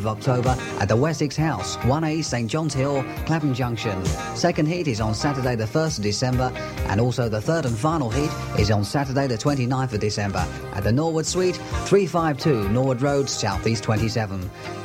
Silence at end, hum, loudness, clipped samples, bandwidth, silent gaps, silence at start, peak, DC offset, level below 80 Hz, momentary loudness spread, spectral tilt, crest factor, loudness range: 0 s; none; -23 LUFS; under 0.1%; 16 kHz; none; 0 s; -6 dBFS; under 0.1%; -40 dBFS; 4 LU; -5.5 dB/octave; 16 dB; 2 LU